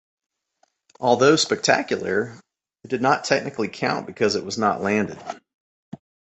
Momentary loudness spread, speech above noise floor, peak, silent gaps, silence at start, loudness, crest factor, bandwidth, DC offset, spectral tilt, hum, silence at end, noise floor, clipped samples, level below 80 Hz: 13 LU; 46 dB; -2 dBFS; 5.54-5.92 s; 1 s; -21 LUFS; 22 dB; 8.2 kHz; under 0.1%; -4 dB/octave; none; 0.35 s; -68 dBFS; under 0.1%; -62 dBFS